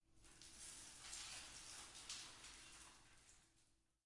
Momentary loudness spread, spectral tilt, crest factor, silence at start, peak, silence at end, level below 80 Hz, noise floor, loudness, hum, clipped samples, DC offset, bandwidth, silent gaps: 15 LU; 0 dB/octave; 24 dB; 0.05 s; -36 dBFS; 0.25 s; -74 dBFS; -79 dBFS; -55 LUFS; none; under 0.1%; under 0.1%; 12 kHz; none